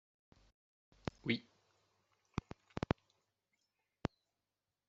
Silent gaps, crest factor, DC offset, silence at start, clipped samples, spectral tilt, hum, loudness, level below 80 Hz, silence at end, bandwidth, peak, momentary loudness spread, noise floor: none; 34 dB; under 0.1%; 1.25 s; under 0.1%; -4.5 dB/octave; none; -44 LUFS; -62 dBFS; 0.8 s; 7.6 kHz; -14 dBFS; 9 LU; under -90 dBFS